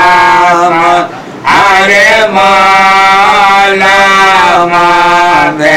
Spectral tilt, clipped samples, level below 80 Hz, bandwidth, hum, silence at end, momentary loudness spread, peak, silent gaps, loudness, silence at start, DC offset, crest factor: -3 dB/octave; 1%; -36 dBFS; 16.5 kHz; none; 0 s; 3 LU; 0 dBFS; none; -4 LUFS; 0 s; 0.7%; 6 dB